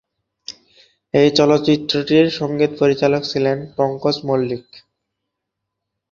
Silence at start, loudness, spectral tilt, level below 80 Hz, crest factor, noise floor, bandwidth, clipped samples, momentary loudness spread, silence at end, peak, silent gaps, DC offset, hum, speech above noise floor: 0.5 s; -17 LUFS; -6 dB/octave; -58 dBFS; 18 dB; -79 dBFS; 7.4 kHz; under 0.1%; 15 LU; 1.35 s; -2 dBFS; none; under 0.1%; none; 63 dB